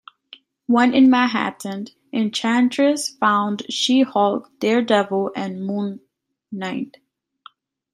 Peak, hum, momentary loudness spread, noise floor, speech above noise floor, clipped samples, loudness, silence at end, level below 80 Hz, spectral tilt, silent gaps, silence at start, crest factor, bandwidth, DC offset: -4 dBFS; none; 15 LU; -50 dBFS; 31 dB; under 0.1%; -19 LUFS; 1.05 s; -70 dBFS; -4.5 dB/octave; none; 0.7 s; 18 dB; 13.5 kHz; under 0.1%